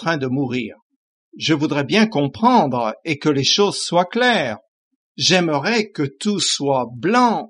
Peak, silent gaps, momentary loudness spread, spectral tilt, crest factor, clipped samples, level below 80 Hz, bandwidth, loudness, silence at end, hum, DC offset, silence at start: -2 dBFS; 0.82-0.90 s, 0.96-1.32 s, 4.68-5.15 s; 8 LU; -4 dB/octave; 16 dB; under 0.1%; -64 dBFS; 11.5 kHz; -18 LUFS; 0.05 s; none; under 0.1%; 0 s